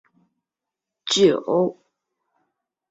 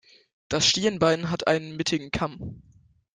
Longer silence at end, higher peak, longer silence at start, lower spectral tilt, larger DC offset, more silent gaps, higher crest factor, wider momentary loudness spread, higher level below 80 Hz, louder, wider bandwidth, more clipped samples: first, 1.2 s vs 0.55 s; first, -4 dBFS vs -8 dBFS; first, 1.05 s vs 0.5 s; about the same, -4 dB/octave vs -3.5 dB/octave; neither; neither; about the same, 20 dB vs 20 dB; about the same, 10 LU vs 11 LU; second, -68 dBFS vs -52 dBFS; first, -20 LUFS vs -24 LUFS; second, 8.2 kHz vs 10 kHz; neither